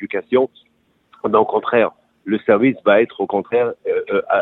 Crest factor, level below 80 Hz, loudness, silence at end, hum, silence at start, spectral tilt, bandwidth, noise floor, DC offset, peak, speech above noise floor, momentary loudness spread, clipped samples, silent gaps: 18 dB; -64 dBFS; -18 LUFS; 0 s; none; 0 s; -9 dB/octave; 4.1 kHz; -54 dBFS; under 0.1%; 0 dBFS; 37 dB; 8 LU; under 0.1%; none